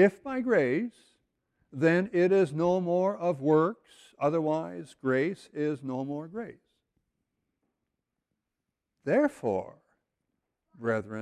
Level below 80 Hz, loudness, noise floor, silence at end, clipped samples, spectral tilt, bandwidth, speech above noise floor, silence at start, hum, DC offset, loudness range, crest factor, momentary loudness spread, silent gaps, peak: -70 dBFS; -28 LUFS; -86 dBFS; 0 s; under 0.1%; -8 dB/octave; 11 kHz; 58 dB; 0 s; none; under 0.1%; 11 LU; 20 dB; 15 LU; none; -10 dBFS